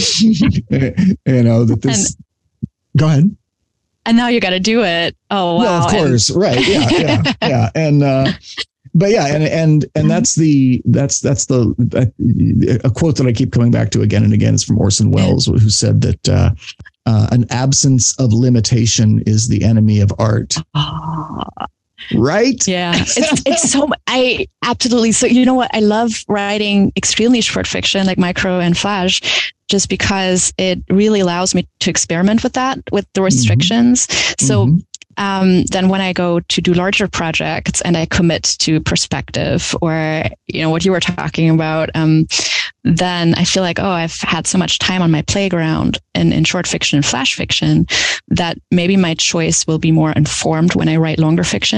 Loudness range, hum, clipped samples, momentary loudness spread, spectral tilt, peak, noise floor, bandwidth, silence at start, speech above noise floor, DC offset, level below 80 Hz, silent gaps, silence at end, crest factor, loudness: 2 LU; none; under 0.1%; 6 LU; -4.5 dB/octave; -2 dBFS; -70 dBFS; 10.5 kHz; 0 s; 57 dB; under 0.1%; -38 dBFS; none; 0 s; 10 dB; -14 LUFS